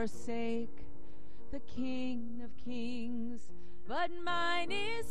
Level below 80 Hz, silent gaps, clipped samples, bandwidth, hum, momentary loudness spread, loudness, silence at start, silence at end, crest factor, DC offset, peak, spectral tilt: -60 dBFS; none; under 0.1%; 12.5 kHz; none; 21 LU; -39 LUFS; 0 s; 0 s; 16 dB; 3%; -22 dBFS; -4.5 dB/octave